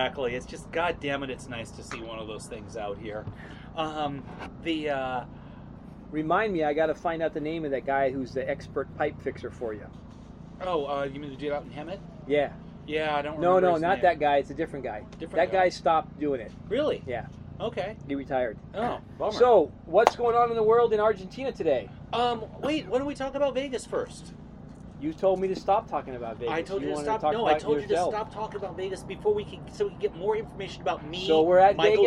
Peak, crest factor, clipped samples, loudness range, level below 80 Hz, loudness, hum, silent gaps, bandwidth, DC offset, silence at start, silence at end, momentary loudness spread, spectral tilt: 0 dBFS; 26 dB; under 0.1%; 9 LU; -52 dBFS; -28 LUFS; none; none; 11.5 kHz; under 0.1%; 0 s; 0 s; 16 LU; -5.5 dB/octave